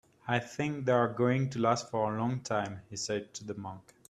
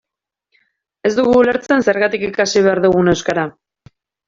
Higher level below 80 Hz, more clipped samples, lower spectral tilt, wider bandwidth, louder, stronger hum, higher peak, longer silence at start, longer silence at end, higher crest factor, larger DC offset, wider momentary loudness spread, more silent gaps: second, -68 dBFS vs -48 dBFS; neither; about the same, -5.5 dB/octave vs -5 dB/octave; first, 11.5 kHz vs 7.6 kHz; second, -32 LUFS vs -15 LUFS; neither; second, -12 dBFS vs -2 dBFS; second, 0.25 s vs 1.05 s; second, 0.3 s vs 0.75 s; first, 20 dB vs 14 dB; neither; first, 12 LU vs 8 LU; neither